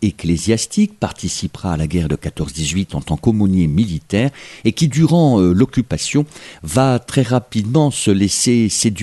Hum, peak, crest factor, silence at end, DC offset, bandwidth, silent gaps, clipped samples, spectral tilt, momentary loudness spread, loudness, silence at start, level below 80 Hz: none; -2 dBFS; 14 dB; 0 s; under 0.1%; 12.5 kHz; none; under 0.1%; -5.5 dB/octave; 9 LU; -17 LUFS; 0 s; -36 dBFS